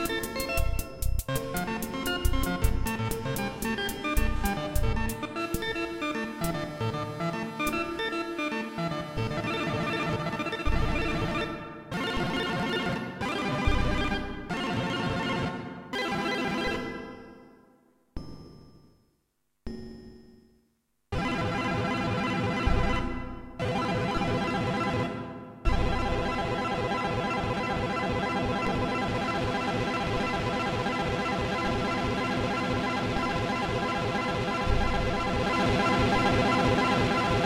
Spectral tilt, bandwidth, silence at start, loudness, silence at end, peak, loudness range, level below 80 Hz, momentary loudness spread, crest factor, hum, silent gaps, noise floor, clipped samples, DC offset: -5.5 dB/octave; 16.5 kHz; 0 s; -29 LUFS; 0 s; -10 dBFS; 6 LU; -36 dBFS; 7 LU; 18 dB; none; none; -76 dBFS; under 0.1%; under 0.1%